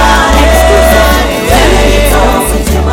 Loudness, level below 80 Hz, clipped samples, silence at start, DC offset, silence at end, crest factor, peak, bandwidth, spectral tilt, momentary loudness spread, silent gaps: -7 LUFS; -10 dBFS; 2%; 0 s; under 0.1%; 0 s; 6 dB; 0 dBFS; 19 kHz; -4.5 dB/octave; 4 LU; none